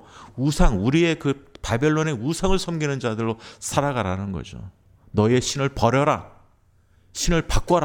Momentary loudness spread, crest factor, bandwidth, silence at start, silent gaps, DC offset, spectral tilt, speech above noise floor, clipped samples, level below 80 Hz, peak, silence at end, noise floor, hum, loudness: 11 LU; 18 dB; 17 kHz; 0.15 s; none; under 0.1%; -5.5 dB/octave; 37 dB; under 0.1%; -30 dBFS; -4 dBFS; 0 s; -58 dBFS; none; -23 LUFS